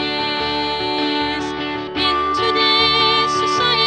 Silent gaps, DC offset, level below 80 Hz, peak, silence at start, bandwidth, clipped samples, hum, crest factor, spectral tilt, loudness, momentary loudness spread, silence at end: none; under 0.1%; -44 dBFS; -2 dBFS; 0 s; 10 kHz; under 0.1%; none; 16 dB; -3.5 dB/octave; -17 LUFS; 9 LU; 0 s